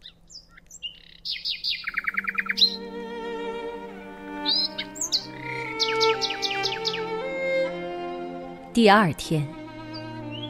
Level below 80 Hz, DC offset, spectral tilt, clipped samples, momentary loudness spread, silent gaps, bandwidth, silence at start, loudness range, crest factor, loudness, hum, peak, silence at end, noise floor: -56 dBFS; under 0.1%; -3.5 dB/octave; under 0.1%; 17 LU; none; 16 kHz; 0.05 s; 2 LU; 24 dB; -25 LUFS; none; -4 dBFS; 0 s; -48 dBFS